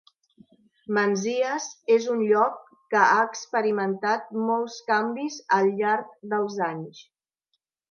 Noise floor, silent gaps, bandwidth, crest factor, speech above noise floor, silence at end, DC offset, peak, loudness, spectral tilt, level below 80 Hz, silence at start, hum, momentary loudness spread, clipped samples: -78 dBFS; none; 7.2 kHz; 20 dB; 54 dB; 0.9 s; under 0.1%; -6 dBFS; -24 LUFS; -4.5 dB/octave; -80 dBFS; 0.9 s; none; 9 LU; under 0.1%